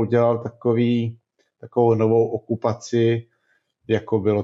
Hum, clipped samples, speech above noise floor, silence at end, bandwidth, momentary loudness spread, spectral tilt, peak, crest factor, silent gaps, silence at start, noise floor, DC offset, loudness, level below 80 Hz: none; under 0.1%; 48 dB; 0 s; 7.8 kHz; 7 LU; -8 dB/octave; -6 dBFS; 14 dB; none; 0 s; -67 dBFS; under 0.1%; -21 LUFS; -68 dBFS